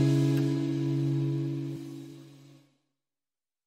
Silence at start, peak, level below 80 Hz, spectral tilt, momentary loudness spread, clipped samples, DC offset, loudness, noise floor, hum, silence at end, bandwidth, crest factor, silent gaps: 0 s; -14 dBFS; -68 dBFS; -8 dB/octave; 19 LU; under 0.1%; under 0.1%; -29 LUFS; under -90 dBFS; none; 1.3 s; 9.8 kHz; 16 dB; none